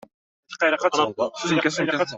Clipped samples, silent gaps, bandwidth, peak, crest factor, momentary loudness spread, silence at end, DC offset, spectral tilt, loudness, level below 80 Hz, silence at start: under 0.1%; none; 8.2 kHz; -6 dBFS; 18 dB; 5 LU; 0 s; under 0.1%; -4 dB/octave; -22 LUFS; -66 dBFS; 0.5 s